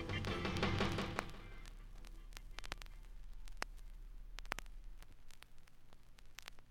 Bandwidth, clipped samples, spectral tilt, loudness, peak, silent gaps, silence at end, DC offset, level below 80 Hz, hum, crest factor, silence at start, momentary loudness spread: 17 kHz; under 0.1%; -5 dB/octave; -44 LUFS; -16 dBFS; none; 0 s; under 0.1%; -52 dBFS; none; 28 dB; 0 s; 23 LU